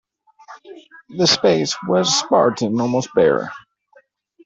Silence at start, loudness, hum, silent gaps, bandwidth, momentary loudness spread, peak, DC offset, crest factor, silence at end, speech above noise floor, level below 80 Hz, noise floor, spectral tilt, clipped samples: 0.5 s; -17 LUFS; none; none; 8 kHz; 7 LU; -2 dBFS; under 0.1%; 18 dB; 0.85 s; 38 dB; -60 dBFS; -55 dBFS; -4 dB/octave; under 0.1%